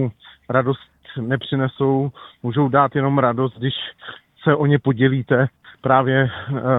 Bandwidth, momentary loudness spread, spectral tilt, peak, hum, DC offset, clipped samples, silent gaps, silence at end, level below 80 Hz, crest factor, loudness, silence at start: 4 kHz; 12 LU; -10.5 dB/octave; 0 dBFS; none; under 0.1%; under 0.1%; none; 0 s; -56 dBFS; 18 dB; -20 LUFS; 0 s